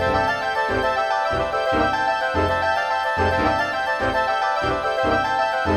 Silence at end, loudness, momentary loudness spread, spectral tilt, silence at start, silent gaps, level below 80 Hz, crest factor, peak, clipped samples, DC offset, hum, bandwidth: 0 s; -21 LUFS; 2 LU; -5 dB/octave; 0 s; none; -40 dBFS; 14 dB; -8 dBFS; under 0.1%; under 0.1%; none; 15.5 kHz